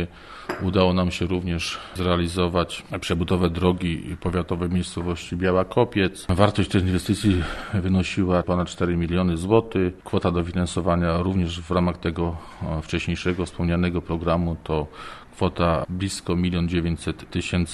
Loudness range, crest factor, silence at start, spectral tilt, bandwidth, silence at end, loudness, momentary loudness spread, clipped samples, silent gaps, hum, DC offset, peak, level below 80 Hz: 3 LU; 22 dB; 0 s; -6.5 dB/octave; 12.5 kHz; 0 s; -24 LUFS; 8 LU; under 0.1%; none; none; under 0.1%; -2 dBFS; -40 dBFS